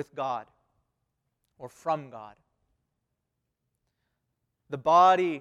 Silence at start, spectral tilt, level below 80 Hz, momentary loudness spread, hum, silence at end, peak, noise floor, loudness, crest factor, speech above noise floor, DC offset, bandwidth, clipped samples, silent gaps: 0 s; -5.5 dB/octave; -74 dBFS; 23 LU; none; 0 s; -8 dBFS; -82 dBFS; -24 LUFS; 22 dB; 56 dB; under 0.1%; 10.5 kHz; under 0.1%; none